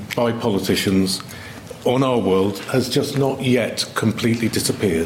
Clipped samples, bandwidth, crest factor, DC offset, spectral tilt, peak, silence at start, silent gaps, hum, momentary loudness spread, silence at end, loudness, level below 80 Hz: under 0.1%; 16.5 kHz; 14 dB; under 0.1%; -5 dB/octave; -6 dBFS; 0 s; none; none; 6 LU; 0 s; -20 LUFS; -50 dBFS